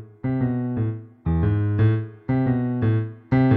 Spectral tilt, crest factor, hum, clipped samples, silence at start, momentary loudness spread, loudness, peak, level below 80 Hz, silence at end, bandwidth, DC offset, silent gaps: -12 dB/octave; 14 dB; none; under 0.1%; 0 s; 6 LU; -23 LUFS; -8 dBFS; -40 dBFS; 0 s; 4.2 kHz; under 0.1%; none